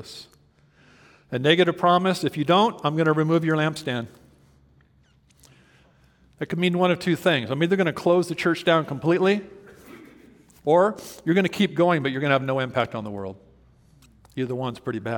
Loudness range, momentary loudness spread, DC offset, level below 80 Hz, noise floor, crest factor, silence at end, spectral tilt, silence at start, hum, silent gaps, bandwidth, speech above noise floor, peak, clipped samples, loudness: 6 LU; 12 LU; under 0.1%; -64 dBFS; -59 dBFS; 22 dB; 0 s; -6 dB/octave; 0 s; none; none; 18 kHz; 37 dB; -2 dBFS; under 0.1%; -22 LUFS